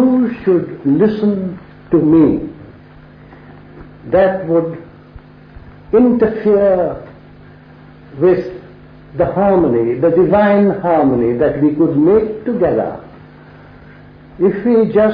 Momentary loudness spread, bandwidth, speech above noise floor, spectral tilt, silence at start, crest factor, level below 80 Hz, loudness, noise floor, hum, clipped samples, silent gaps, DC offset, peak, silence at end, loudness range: 13 LU; 5.2 kHz; 27 dB; -11.5 dB/octave; 0 s; 12 dB; -42 dBFS; -14 LUFS; -39 dBFS; none; under 0.1%; none; under 0.1%; -2 dBFS; 0 s; 5 LU